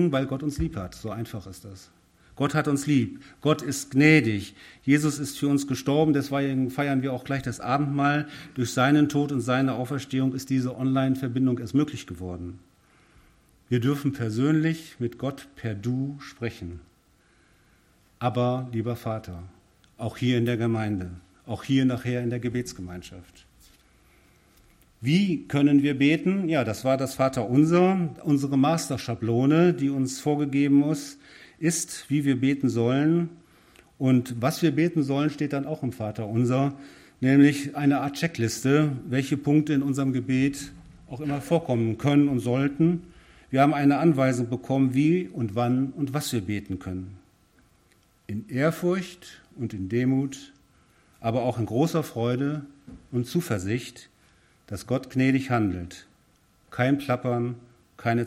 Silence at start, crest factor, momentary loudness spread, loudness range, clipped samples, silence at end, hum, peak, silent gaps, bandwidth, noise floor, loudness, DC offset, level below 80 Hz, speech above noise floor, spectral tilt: 0 s; 20 dB; 15 LU; 7 LU; under 0.1%; 0 s; none; -4 dBFS; none; 16 kHz; -62 dBFS; -25 LUFS; under 0.1%; -56 dBFS; 38 dB; -6.5 dB/octave